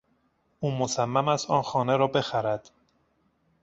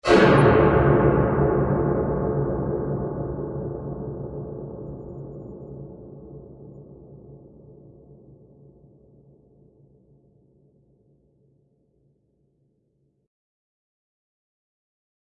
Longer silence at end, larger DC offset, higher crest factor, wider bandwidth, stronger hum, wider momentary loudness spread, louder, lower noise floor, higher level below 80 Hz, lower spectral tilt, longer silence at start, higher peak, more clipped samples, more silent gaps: second, 1.05 s vs 7.85 s; neither; about the same, 20 dB vs 22 dB; second, 8.2 kHz vs 10.5 kHz; neither; second, 7 LU vs 27 LU; second, -26 LUFS vs -22 LUFS; about the same, -70 dBFS vs -69 dBFS; second, -64 dBFS vs -40 dBFS; second, -5 dB/octave vs -8 dB/octave; first, 0.6 s vs 0.05 s; second, -8 dBFS vs -4 dBFS; neither; neither